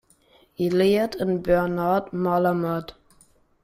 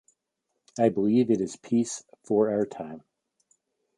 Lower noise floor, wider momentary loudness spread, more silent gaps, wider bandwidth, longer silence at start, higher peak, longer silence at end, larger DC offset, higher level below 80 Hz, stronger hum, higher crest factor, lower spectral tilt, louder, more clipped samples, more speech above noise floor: second, -59 dBFS vs -81 dBFS; second, 8 LU vs 17 LU; neither; first, 15.5 kHz vs 11 kHz; second, 0.6 s vs 0.75 s; about the same, -6 dBFS vs -8 dBFS; second, 0.7 s vs 1 s; neither; first, -50 dBFS vs -70 dBFS; neither; about the same, 16 dB vs 20 dB; about the same, -7.5 dB/octave vs -6.5 dB/octave; first, -23 LUFS vs -26 LUFS; neither; second, 37 dB vs 56 dB